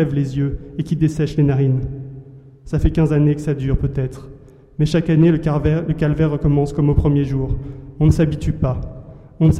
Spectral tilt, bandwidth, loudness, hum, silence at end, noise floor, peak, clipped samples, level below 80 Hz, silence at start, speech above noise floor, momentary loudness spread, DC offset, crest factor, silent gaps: -9 dB/octave; 9.2 kHz; -18 LUFS; none; 0 s; -39 dBFS; -4 dBFS; under 0.1%; -30 dBFS; 0 s; 23 dB; 13 LU; under 0.1%; 14 dB; none